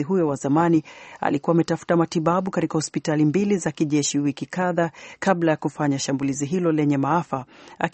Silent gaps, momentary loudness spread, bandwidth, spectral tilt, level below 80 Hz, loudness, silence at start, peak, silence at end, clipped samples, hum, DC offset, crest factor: none; 6 LU; 8.8 kHz; -6 dB/octave; -62 dBFS; -22 LUFS; 0 s; -4 dBFS; 0.05 s; under 0.1%; none; under 0.1%; 18 dB